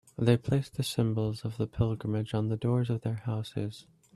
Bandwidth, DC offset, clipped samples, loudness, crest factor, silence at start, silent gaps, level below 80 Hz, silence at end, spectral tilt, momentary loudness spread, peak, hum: 13 kHz; under 0.1%; under 0.1%; -31 LUFS; 20 dB; 0.2 s; none; -56 dBFS; 0.35 s; -7 dB/octave; 8 LU; -10 dBFS; none